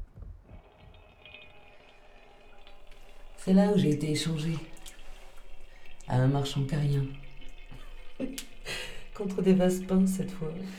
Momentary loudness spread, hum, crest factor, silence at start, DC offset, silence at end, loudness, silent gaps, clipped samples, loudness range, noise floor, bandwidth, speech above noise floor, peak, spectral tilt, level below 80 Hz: 25 LU; none; 20 dB; 0 s; under 0.1%; 0 s; -29 LUFS; none; under 0.1%; 3 LU; -54 dBFS; 14.5 kHz; 27 dB; -12 dBFS; -6.5 dB/octave; -46 dBFS